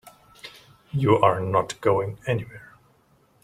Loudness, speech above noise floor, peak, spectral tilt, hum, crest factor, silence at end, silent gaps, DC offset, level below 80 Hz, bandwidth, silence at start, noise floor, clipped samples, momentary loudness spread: -23 LUFS; 39 dB; -4 dBFS; -6.5 dB/octave; none; 22 dB; 0.8 s; none; under 0.1%; -58 dBFS; 15 kHz; 0.05 s; -61 dBFS; under 0.1%; 24 LU